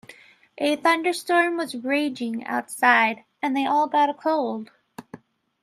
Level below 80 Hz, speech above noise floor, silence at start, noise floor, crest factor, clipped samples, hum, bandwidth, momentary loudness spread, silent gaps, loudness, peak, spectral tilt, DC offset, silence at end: -78 dBFS; 27 dB; 0.1 s; -50 dBFS; 22 dB; under 0.1%; none; 15.5 kHz; 11 LU; none; -22 LUFS; -2 dBFS; -3 dB/octave; under 0.1%; 0.45 s